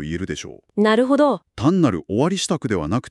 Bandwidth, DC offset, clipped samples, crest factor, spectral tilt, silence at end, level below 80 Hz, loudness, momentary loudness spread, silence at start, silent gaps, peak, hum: 12 kHz; under 0.1%; under 0.1%; 16 dB; -5.5 dB/octave; 0 s; -46 dBFS; -20 LUFS; 11 LU; 0 s; none; -4 dBFS; none